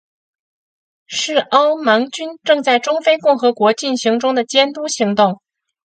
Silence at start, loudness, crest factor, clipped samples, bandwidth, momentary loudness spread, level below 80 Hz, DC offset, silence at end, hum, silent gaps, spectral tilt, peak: 1.1 s; -15 LUFS; 16 dB; under 0.1%; 9.2 kHz; 6 LU; -70 dBFS; under 0.1%; 0.55 s; none; none; -3 dB/octave; 0 dBFS